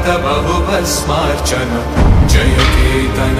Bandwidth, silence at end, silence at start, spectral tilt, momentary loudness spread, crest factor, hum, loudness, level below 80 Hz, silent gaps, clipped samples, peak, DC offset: 15.5 kHz; 0 s; 0 s; -5 dB/octave; 5 LU; 12 dB; none; -13 LUFS; -16 dBFS; none; under 0.1%; 0 dBFS; under 0.1%